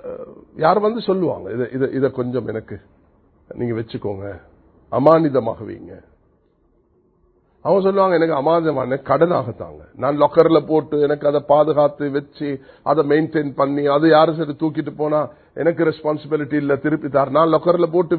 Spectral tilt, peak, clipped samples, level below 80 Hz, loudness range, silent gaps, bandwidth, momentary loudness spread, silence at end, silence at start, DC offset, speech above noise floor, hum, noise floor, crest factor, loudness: -10.5 dB/octave; 0 dBFS; under 0.1%; -54 dBFS; 5 LU; none; 4.6 kHz; 14 LU; 0 s; 0.05 s; under 0.1%; 42 dB; none; -60 dBFS; 18 dB; -18 LUFS